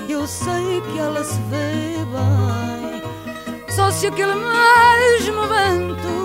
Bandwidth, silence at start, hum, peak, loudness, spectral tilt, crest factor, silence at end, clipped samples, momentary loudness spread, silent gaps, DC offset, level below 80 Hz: 16 kHz; 0 s; none; -2 dBFS; -17 LUFS; -4.5 dB/octave; 16 dB; 0 s; under 0.1%; 16 LU; none; under 0.1%; -46 dBFS